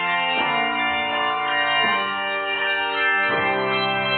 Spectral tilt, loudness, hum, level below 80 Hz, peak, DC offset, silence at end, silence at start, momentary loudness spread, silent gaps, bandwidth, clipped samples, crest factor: -7 dB/octave; -20 LUFS; none; -60 dBFS; -8 dBFS; under 0.1%; 0 s; 0 s; 3 LU; none; 4.7 kHz; under 0.1%; 14 dB